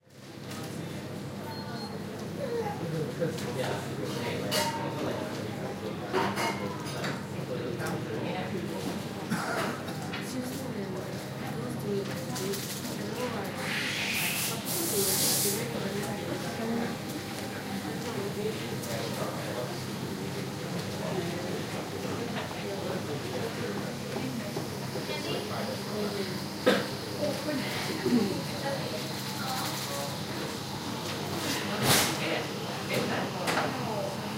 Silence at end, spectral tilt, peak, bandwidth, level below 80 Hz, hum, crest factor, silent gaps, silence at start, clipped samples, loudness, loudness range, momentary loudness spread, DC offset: 0 s; -4 dB/octave; -10 dBFS; 16 kHz; -62 dBFS; none; 22 dB; none; 0.1 s; under 0.1%; -32 LUFS; 6 LU; 8 LU; under 0.1%